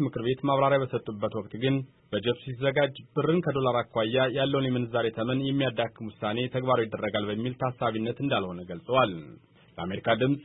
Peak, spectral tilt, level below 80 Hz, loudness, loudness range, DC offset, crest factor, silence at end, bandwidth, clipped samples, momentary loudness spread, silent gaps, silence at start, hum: -10 dBFS; -10.5 dB/octave; -62 dBFS; -28 LUFS; 2 LU; under 0.1%; 18 dB; 0 s; 4.1 kHz; under 0.1%; 7 LU; none; 0 s; none